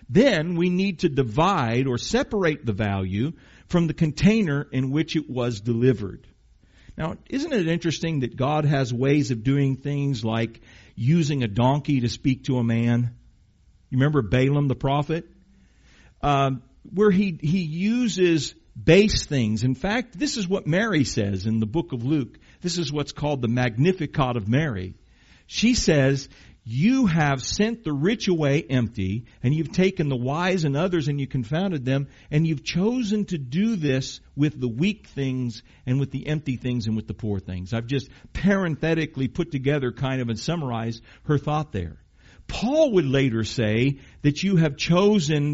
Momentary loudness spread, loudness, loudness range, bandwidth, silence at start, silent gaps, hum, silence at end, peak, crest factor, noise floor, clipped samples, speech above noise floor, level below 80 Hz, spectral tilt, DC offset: 9 LU; -24 LUFS; 4 LU; 8 kHz; 0 s; none; none; 0 s; -4 dBFS; 20 dB; -57 dBFS; under 0.1%; 34 dB; -46 dBFS; -6 dB/octave; under 0.1%